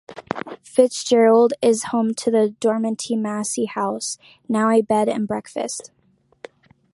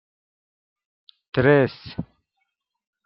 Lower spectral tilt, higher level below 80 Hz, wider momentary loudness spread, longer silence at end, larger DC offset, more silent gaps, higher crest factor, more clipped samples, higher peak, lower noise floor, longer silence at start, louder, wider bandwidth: second, -4.5 dB/octave vs -10.5 dB/octave; second, -66 dBFS vs -56 dBFS; second, 14 LU vs 18 LU; about the same, 1.15 s vs 1.05 s; neither; neither; about the same, 18 dB vs 22 dB; neither; about the same, -2 dBFS vs -4 dBFS; second, -44 dBFS vs -77 dBFS; second, 0.1 s vs 1.35 s; about the same, -20 LUFS vs -20 LUFS; first, 11.5 kHz vs 5.8 kHz